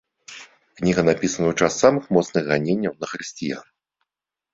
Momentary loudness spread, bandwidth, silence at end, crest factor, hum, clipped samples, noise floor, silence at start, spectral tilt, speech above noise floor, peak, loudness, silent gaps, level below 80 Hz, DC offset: 20 LU; 7.8 kHz; 0.9 s; 22 dB; none; under 0.1%; -87 dBFS; 0.3 s; -5 dB/octave; 66 dB; -2 dBFS; -21 LUFS; none; -54 dBFS; under 0.1%